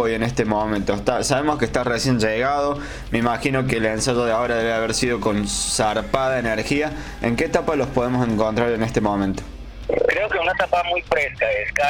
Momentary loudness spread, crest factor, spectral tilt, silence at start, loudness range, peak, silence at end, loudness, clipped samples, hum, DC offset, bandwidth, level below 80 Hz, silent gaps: 4 LU; 14 dB; -4.5 dB/octave; 0 s; 1 LU; -6 dBFS; 0 s; -21 LUFS; under 0.1%; none; under 0.1%; 18 kHz; -38 dBFS; none